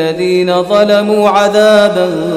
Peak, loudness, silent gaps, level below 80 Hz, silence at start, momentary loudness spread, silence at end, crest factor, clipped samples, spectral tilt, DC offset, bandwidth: 0 dBFS; -9 LUFS; none; -50 dBFS; 0 s; 5 LU; 0 s; 10 dB; under 0.1%; -5 dB/octave; under 0.1%; 14.5 kHz